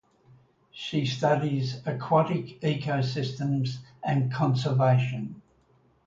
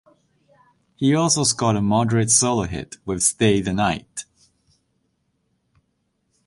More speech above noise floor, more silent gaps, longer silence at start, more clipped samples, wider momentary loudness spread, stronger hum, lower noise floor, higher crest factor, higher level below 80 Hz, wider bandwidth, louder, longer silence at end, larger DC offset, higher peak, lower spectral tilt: second, 38 dB vs 51 dB; neither; second, 0.75 s vs 1 s; neither; second, 10 LU vs 13 LU; neither; second, -64 dBFS vs -71 dBFS; about the same, 18 dB vs 20 dB; second, -64 dBFS vs -48 dBFS; second, 7.6 kHz vs 11.5 kHz; second, -27 LUFS vs -19 LUFS; second, 0.65 s vs 2.25 s; neither; second, -10 dBFS vs -4 dBFS; first, -7 dB/octave vs -4 dB/octave